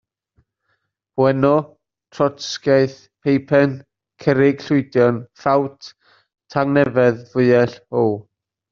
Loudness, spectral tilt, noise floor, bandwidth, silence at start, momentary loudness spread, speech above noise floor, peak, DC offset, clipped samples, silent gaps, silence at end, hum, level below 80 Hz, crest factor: -18 LUFS; -6 dB/octave; -70 dBFS; 7.4 kHz; 1.15 s; 9 LU; 53 dB; -2 dBFS; under 0.1%; under 0.1%; none; 0.5 s; none; -58 dBFS; 18 dB